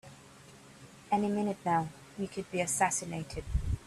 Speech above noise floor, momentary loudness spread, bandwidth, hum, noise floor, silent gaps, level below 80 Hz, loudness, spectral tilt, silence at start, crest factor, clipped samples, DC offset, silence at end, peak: 23 dB; 24 LU; 13.5 kHz; none; -55 dBFS; none; -44 dBFS; -33 LUFS; -4.5 dB/octave; 0.05 s; 20 dB; under 0.1%; under 0.1%; 0 s; -14 dBFS